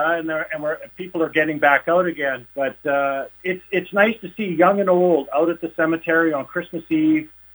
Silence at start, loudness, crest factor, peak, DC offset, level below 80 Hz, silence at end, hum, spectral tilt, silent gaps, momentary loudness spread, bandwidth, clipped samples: 0 s; -20 LUFS; 18 dB; -2 dBFS; under 0.1%; -62 dBFS; 0.25 s; none; -7.5 dB/octave; none; 10 LU; over 20 kHz; under 0.1%